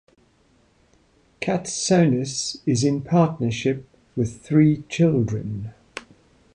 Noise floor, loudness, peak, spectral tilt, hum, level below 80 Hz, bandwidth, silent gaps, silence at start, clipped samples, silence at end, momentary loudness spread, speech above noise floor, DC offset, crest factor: -60 dBFS; -22 LUFS; -6 dBFS; -6 dB/octave; none; -54 dBFS; 10.5 kHz; none; 1.4 s; under 0.1%; 0.55 s; 16 LU; 39 dB; under 0.1%; 18 dB